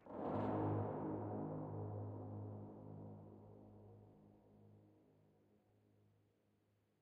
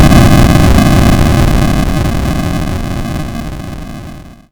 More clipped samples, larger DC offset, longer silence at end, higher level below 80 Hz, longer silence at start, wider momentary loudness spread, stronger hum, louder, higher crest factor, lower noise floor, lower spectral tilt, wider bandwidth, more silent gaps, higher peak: second, under 0.1% vs 0.7%; neither; first, 2.05 s vs 0.2 s; second, -74 dBFS vs -14 dBFS; about the same, 0 s vs 0 s; first, 23 LU vs 18 LU; neither; second, -46 LUFS vs -10 LUFS; first, 18 dB vs 10 dB; first, -80 dBFS vs -29 dBFS; first, -9.5 dB/octave vs -6 dB/octave; second, 4.3 kHz vs over 20 kHz; neither; second, -30 dBFS vs 0 dBFS